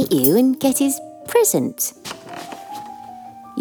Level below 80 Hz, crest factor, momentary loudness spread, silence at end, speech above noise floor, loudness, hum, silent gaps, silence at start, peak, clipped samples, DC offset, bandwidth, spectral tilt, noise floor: -62 dBFS; 18 dB; 20 LU; 0 s; 21 dB; -18 LUFS; none; none; 0 s; -2 dBFS; under 0.1%; under 0.1%; over 20 kHz; -4 dB/octave; -38 dBFS